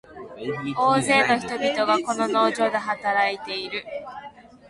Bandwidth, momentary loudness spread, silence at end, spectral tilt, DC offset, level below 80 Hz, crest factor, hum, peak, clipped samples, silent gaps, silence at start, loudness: 11.5 kHz; 16 LU; 0.15 s; -4 dB/octave; under 0.1%; -62 dBFS; 18 dB; none; -6 dBFS; under 0.1%; none; 0.1 s; -22 LUFS